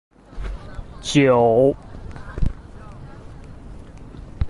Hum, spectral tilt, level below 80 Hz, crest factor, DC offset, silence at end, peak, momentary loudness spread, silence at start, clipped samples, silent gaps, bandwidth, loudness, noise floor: none; -6 dB/octave; -32 dBFS; 18 dB; under 0.1%; 0 s; -4 dBFS; 26 LU; 0.35 s; under 0.1%; none; 11.5 kHz; -18 LUFS; -38 dBFS